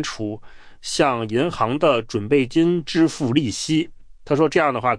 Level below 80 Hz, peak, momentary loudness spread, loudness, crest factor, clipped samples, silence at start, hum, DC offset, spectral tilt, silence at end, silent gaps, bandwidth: -48 dBFS; -4 dBFS; 11 LU; -20 LUFS; 16 dB; under 0.1%; 0 s; none; under 0.1%; -5 dB/octave; 0 s; none; 10.5 kHz